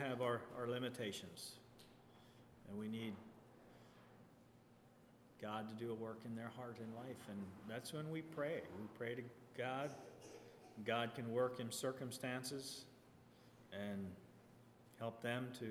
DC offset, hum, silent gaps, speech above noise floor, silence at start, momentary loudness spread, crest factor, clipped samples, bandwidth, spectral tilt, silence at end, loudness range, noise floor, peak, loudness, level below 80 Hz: under 0.1%; none; none; 21 dB; 0 s; 23 LU; 22 dB; under 0.1%; 19.5 kHz; -5 dB/octave; 0 s; 9 LU; -67 dBFS; -26 dBFS; -47 LUFS; -82 dBFS